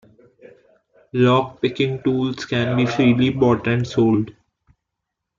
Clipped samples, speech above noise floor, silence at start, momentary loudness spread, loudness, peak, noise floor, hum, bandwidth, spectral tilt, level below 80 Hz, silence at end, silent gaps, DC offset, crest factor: under 0.1%; 62 dB; 1.15 s; 6 LU; -19 LUFS; -4 dBFS; -81 dBFS; none; 7.4 kHz; -7 dB/octave; -54 dBFS; 1.05 s; none; under 0.1%; 16 dB